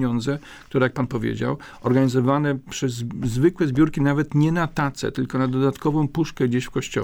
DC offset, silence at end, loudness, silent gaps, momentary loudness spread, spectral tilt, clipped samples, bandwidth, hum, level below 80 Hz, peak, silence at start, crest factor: under 0.1%; 0 s; -22 LUFS; none; 7 LU; -7 dB/octave; under 0.1%; 16.5 kHz; none; -46 dBFS; -6 dBFS; 0 s; 16 dB